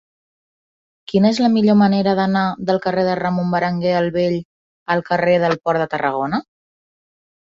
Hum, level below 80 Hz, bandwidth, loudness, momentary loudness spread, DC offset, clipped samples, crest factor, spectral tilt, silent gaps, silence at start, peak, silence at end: none; -56 dBFS; 7.6 kHz; -18 LUFS; 8 LU; under 0.1%; under 0.1%; 16 dB; -7 dB/octave; 4.45-4.86 s; 1.1 s; -4 dBFS; 1.05 s